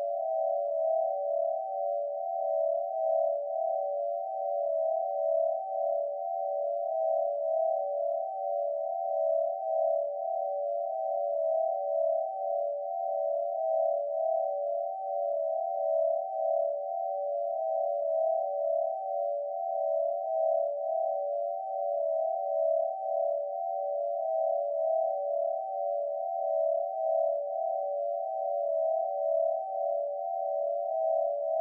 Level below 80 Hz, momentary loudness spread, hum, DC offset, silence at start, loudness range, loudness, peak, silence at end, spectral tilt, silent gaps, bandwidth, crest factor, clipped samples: under -90 dBFS; 4 LU; none; under 0.1%; 0 s; 1 LU; -31 LUFS; -18 dBFS; 0 s; 24 dB/octave; none; 0.9 kHz; 12 dB; under 0.1%